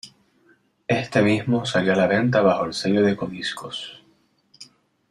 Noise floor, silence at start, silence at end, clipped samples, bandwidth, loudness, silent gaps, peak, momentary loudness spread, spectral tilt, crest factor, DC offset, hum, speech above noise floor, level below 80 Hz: -62 dBFS; 0.05 s; 0.45 s; under 0.1%; 12.5 kHz; -21 LUFS; none; -4 dBFS; 13 LU; -6 dB/octave; 18 dB; under 0.1%; none; 41 dB; -60 dBFS